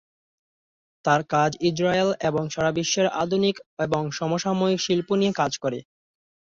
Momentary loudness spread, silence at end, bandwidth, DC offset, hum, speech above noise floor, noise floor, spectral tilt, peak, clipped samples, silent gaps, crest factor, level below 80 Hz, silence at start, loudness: 5 LU; 0.65 s; 7.8 kHz; under 0.1%; none; over 67 dB; under -90 dBFS; -4.5 dB/octave; -6 dBFS; under 0.1%; 3.66-3.77 s; 18 dB; -60 dBFS; 1.05 s; -24 LUFS